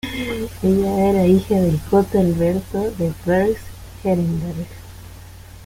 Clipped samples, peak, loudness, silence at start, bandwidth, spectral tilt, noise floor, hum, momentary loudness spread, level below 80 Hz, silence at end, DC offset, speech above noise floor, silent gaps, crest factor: under 0.1%; -4 dBFS; -19 LUFS; 0.05 s; 16.5 kHz; -7.5 dB/octave; -39 dBFS; none; 18 LU; -38 dBFS; 0 s; under 0.1%; 21 dB; none; 16 dB